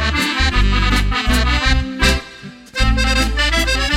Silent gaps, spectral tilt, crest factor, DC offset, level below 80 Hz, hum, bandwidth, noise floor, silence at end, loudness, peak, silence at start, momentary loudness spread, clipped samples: none; -4 dB/octave; 14 dB; under 0.1%; -18 dBFS; none; 15.5 kHz; -36 dBFS; 0 s; -16 LUFS; -2 dBFS; 0 s; 6 LU; under 0.1%